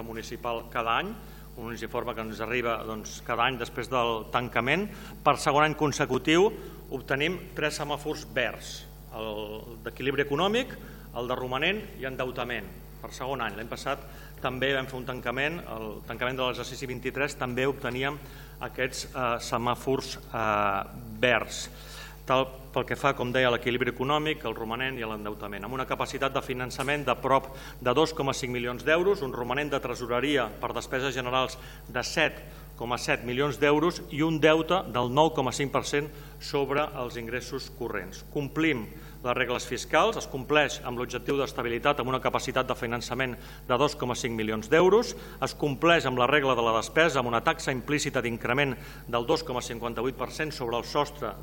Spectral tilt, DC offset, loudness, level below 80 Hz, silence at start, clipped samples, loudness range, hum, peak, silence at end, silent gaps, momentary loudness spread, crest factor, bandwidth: -4.5 dB/octave; under 0.1%; -28 LUFS; -48 dBFS; 0 s; under 0.1%; 6 LU; none; -6 dBFS; 0 s; none; 13 LU; 22 dB; 17.5 kHz